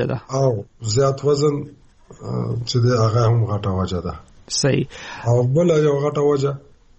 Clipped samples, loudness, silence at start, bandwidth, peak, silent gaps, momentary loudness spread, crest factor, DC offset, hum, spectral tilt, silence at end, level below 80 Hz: under 0.1%; -20 LUFS; 0 s; 8.4 kHz; -8 dBFS; none; 12 LU; 12 dB; under 0.1%; none; -6 dB/octave; 0.4 s; -46 dBFS